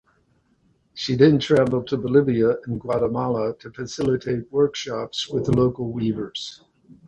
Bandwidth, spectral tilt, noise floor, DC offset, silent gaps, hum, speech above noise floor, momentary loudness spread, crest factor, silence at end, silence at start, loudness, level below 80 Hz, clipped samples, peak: 10 kHz; -6.5 dB/octave; -64 dBFS; under 0.1%; none; none; 42 dB; 13 LU; 18 dB; 0.15 s; 0.95 s; -22 LUFS; -52 dBFS; under 0.1%; -4 dBFS